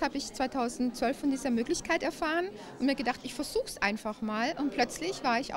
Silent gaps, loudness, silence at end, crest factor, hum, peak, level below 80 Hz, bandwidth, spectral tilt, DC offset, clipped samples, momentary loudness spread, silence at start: none; -31 LUFS; 0 s; 20 dB; none; -12 dBFS; -56 dBFS; 16 kHz; -3.5 dB/octave; under 0.1%; under 0.1%; 4 LU; 0 s